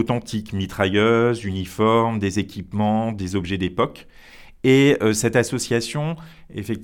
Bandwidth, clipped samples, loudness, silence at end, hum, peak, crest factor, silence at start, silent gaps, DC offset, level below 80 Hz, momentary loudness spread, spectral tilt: 18 kHz; under 0.1%; -21 LUFS; 0 s; none; -4 dBFS; 18 dB; 0 s; none; under 0.1%; -48 dBFS; 11 LU; -5.5 dB/octave